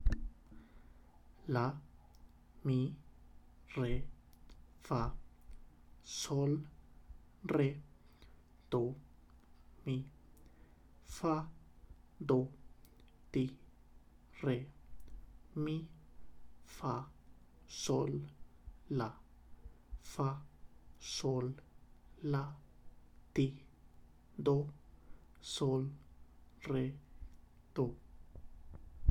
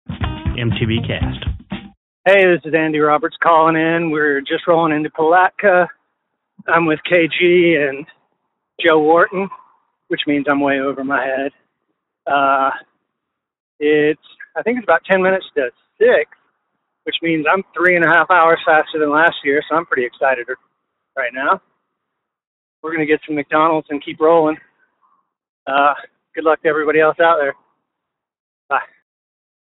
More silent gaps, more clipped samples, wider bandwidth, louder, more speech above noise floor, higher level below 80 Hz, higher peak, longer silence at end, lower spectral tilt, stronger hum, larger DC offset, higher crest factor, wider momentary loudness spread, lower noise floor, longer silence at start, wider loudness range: second, none vs 1.97-2.24 s, 13.60-13.79 s, 22.47-22.83 s, 25.49-25.66 s, 28.40-28.69 s; neither; first, 13 kHz vs 4.1 kHz; second, -40 LUFS vs -15 LUFS; second, 24 dB vs 64 dB; second, -52 dBFS vs -42 dBFS; second, -16 dBFS vs 0 dBFS; second, 0 s vs 0.9 s; first, -6.5 dB/octave vs -3.5 dB/octave; first, 60 Hz at -65 dBFS vs none; neither; first, 26 dB vs 16 dB; first, 24 LU vs 14 LU; second, -61 dBFS vs -79 dBFS; about the same, 0 s vs 0.1 s; about the same, 5 LU vs 5 LU